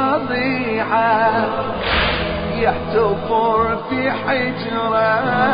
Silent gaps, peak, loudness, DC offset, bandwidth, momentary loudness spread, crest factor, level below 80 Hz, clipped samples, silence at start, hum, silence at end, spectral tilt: none; -4 dBFS; -18 LUFS; under 0.1%; 5.2 kHz; 5 LU; 14 dB; -36 dBFS; under 0.1%; 0 s; none; 0 s; -10.5 dB/octave